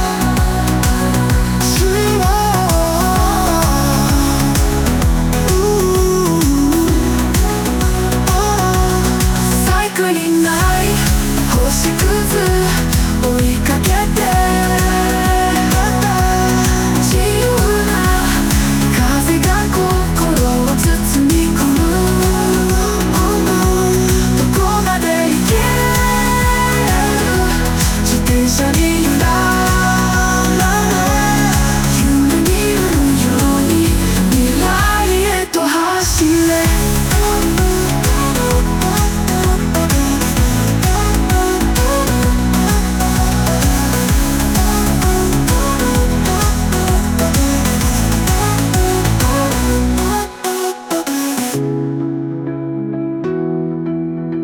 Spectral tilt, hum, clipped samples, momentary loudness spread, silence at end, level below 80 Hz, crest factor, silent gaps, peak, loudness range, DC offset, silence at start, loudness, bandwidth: -4.5 dB/octave; none; under 0.1%; 2 LU; 0 s; -20 dBFS; 12 dB; none; 0 dBFS; 1 LU; under 0.1%; 0 s; -14 LUFS; over 20 kHz